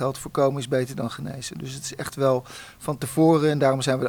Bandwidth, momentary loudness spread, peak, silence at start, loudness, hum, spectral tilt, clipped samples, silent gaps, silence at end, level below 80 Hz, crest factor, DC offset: over 20 kHz; 14 LU; -8 dBFS; 0 s; -24 LUFS; none; -5.5 dB/octave; under 0.1%; none; 0 s; -56 dBFS; 16 dB; under 0.1%